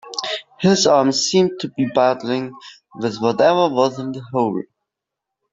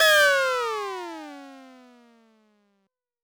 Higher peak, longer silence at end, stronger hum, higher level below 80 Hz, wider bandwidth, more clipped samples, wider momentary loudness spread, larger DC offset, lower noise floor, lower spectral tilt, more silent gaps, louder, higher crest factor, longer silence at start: first, -2 dBFS vs -8 dBFS; second, 0.9 s vs 1.6 s; neither; first, -60 dBFS vs -70 dBFS; second, 8 kHz vs over 20 kHz; neither; second, 12 LU vs 25 LU; neither; first, -83 dBFS vs -75 dBFS; first, -4.5 dB/octave vs 0.5 dB/octave; neither; first, -18 LUFS vs -22 LUFS; about the same, 16 dB vs 18 dB; about the same, 0.05 s vs 0 s